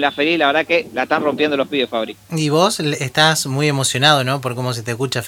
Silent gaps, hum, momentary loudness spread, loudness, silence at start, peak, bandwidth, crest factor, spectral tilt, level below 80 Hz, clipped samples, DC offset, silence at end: none; none; 9 LU; -17 LUFS; 0 s; 0 dBFS; 17 kHz; 18 dB; -4 dB/octave; -60 dBFS; under 0.1%; under 0.1%; 0 s